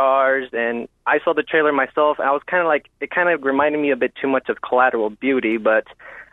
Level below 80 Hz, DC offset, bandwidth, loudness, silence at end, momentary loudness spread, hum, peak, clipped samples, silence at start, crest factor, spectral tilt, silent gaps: -62 dBFS; under 0.1%; 4 kHz; -19 LUFS; 0.1 s; 6 LU; none; -2 dBFS; under 0.1%; 0 s; 16 dB; -7.5 dB/octave; none